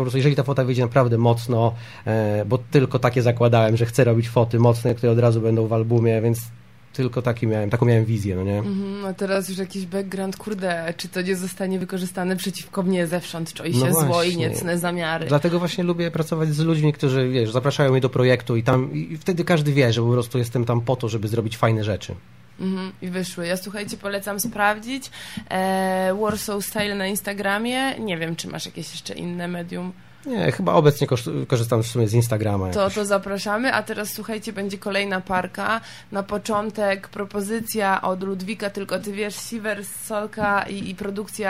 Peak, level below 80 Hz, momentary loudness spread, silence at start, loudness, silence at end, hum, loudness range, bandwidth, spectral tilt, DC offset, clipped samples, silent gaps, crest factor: -4 dBFS; -54 dBFS; 11 LU; 0 s; -22 LUFS; 0 s; none; 6 LU; 16 kHz; -6 dB/octave; 0.3%; under 0.1%; none; 18 dB